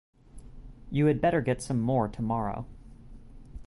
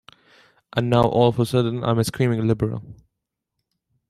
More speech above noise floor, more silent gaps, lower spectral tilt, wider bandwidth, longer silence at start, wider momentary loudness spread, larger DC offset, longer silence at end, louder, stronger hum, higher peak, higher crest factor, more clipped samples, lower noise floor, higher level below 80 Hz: second, 20 dB vs 61 dB; neither; about the same, -7.5 dB/octave vs -7 dB/octave; second, 11.5 kHz vs 14 kHz; second, 0.35 s vs 0.75 s; first, 15 LU vs 9 LU; neither; second, 0 s vs 1.15 s; second, -28 LUFS vs -21 LUFS; neither; second, -12 dBFS vs -2 dBFS; about the same, 18 dB vs 20 dB; neither; second, -47 dBFS vs -81 dBFS; about the same, -48 dBFS vs -50 dBFS